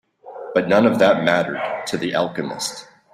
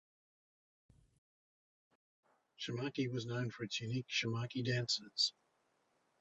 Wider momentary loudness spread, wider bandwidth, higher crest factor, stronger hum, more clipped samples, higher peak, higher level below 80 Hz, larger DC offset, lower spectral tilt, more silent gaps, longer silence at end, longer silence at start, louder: first, 12 LU vs 6 LU; first, 15 kHz vs 8.2 kHz; about the same, 18 dB vs 22 dB; neither; neither; first, -2 dBFS vs -22 dBFS; first, -60 dBFS vs -76 dBFS; neither; about the same, -4.5 dB/octave vs -4 dB/octave; neither; second, 0.3 s vs 0.9 s; second, 0.25 s vs 2.6 s; first, -19 LUFS vs -39 LUFS